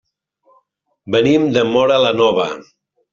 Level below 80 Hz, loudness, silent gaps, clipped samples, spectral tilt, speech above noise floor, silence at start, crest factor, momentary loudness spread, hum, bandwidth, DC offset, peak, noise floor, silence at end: -56 dBFS; -15 LUFS; none; under 0.1%; -5.5 dB/octave; 48 dB; 1.05 s; 16 dB; 8 LU; none; 7.6 kHz; under 0.1%; -2 dBFS; -62 dBFS; 0.5 s